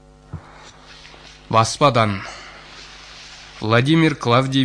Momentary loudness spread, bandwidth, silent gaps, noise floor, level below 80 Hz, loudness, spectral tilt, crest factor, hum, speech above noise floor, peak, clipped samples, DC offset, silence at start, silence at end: 23 LU; 10.5 kHz; none; -43 dBFS; -50 dBFS; -17 LUFS; -5.5 dB/octave; 18 dB; none; 27 dB; -2 dBFS; under 0.1%; under 0.1%; 0.35 s; 0 s